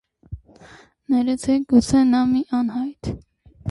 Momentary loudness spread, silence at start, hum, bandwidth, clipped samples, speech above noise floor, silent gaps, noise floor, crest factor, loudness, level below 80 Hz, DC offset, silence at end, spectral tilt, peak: 23 LU; 0.3 s; none; 11.5 kHz; under 0.1%; 29 dB; none; -48 dBFS; 16 dB; -19 LUFS; -44 dBFS; under 0.1%; 0 s; -6 dB/octave; -4 dBFS